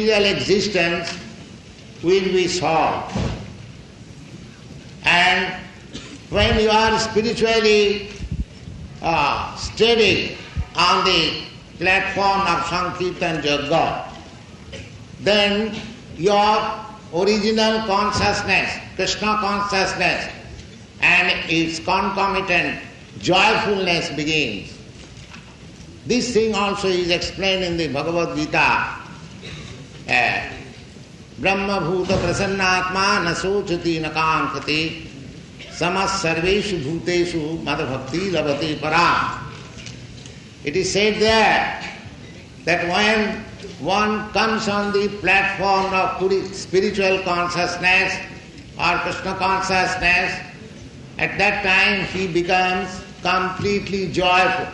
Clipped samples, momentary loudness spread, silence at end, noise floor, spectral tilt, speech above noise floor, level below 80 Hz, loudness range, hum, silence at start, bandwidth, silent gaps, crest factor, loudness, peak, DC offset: under 0.1%; 21 LU; 0 s; -40 dBFS; -4 dB/octave; 21 dB; -42 dBFS; 4 LU; none; 0 s; 11 kHz; none; 18 dB; -19 LUFS; -2 dBFS; under 0.1%